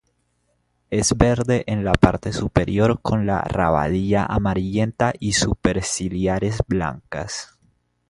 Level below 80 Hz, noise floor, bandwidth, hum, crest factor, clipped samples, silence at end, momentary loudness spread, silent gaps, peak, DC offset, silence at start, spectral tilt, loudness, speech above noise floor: -34 dBFS; -68 dBFS; 11.5 kHz; none; 20 dB; under 0.1%; 0.65 s; 9 LU; none; 0 dBFS; under 0.1%; 0.9 s; -5.5 dB/octave; -21 LUFS; 48 dB